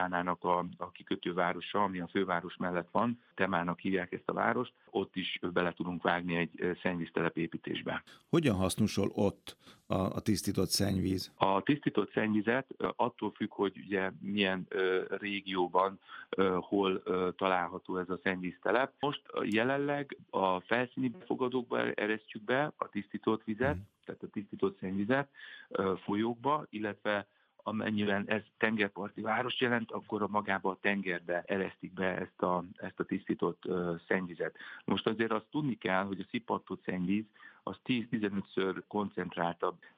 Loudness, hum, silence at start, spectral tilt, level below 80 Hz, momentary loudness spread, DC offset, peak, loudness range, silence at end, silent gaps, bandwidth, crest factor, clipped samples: -34 LUFS; none; 0 s; -5.5 dB/octave; -72 dBFS; 7 LU; under 0.1%; -10 dBFS; 3 LU; 0.15 s; none; 15.5 kHz; 24 dB; under 0.1%